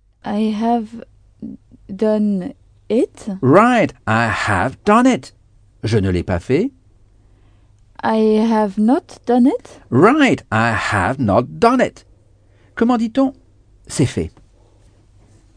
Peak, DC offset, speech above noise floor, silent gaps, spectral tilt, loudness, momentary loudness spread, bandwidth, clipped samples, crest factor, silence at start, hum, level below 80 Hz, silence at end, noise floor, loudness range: 0 dBFS; under 0.1%; 35 dB; none; -6.5 dB/octave; -17 LUFS; 14 LU; 10 kHz; under 0.1%; 18 dB; 0.25 s; none; -46 dBFS; 1.25 s; -51 dBFS; 6 LU